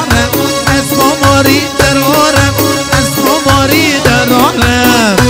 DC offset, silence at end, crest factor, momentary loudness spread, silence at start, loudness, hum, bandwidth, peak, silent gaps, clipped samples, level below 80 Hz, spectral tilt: under 0.1%; 0 s; 8 dB; 3 LU; 0 s; -8 LUFS; none; 16.5 kHz; 0 dBFS; none; 0.9%; -26 dBFS; -4 dB/octave